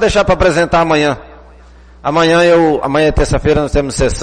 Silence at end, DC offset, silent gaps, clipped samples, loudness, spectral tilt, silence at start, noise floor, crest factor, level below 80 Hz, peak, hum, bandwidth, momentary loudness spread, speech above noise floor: 0 s; under 0.1%; none; under 0.1%; -12 LUFS; -5 dB/octave; 0 s; -39 dBFS; 10 dB; -24 dBFS; -2 dBFS; 60 Hz at -40 dBFS; 10 kHz; 7 LU; 28 dB